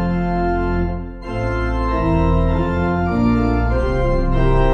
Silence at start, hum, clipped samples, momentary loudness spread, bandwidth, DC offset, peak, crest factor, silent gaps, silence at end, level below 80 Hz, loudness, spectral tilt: 0 s; none; under 0.1%; 6 LU; 6.6 kHz; under 0.1%; -4 dBFS; 12 dB; none; 0 s; -22 dBFS; -19 LUFS; -9 dB/octave